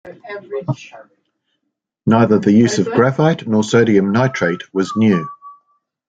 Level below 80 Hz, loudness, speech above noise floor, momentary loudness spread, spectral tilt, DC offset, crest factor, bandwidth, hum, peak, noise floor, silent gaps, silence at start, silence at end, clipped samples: -56 dBFS; -15 LUFS; 60 dB; 14 LU; -6.5 dB/octave; under 0.1%; 14 dB; 9 kHz; none; -2 dBFS; -75 dBFS; none; 0.05 s; 0.55 s; under 0.1%